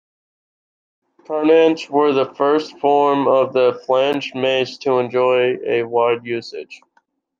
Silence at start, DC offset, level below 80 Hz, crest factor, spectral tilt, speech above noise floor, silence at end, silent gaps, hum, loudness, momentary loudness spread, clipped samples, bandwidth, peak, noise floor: 1.3 s; under 0.1%; -70 dBFS; 16 dB; -5.5 dB/octave; 46 dB; 0.65 s; none; none; -17 LUFS; 9 LU; under 0.1%; 7.2 kHz; -2 dBFS; -63 dBFS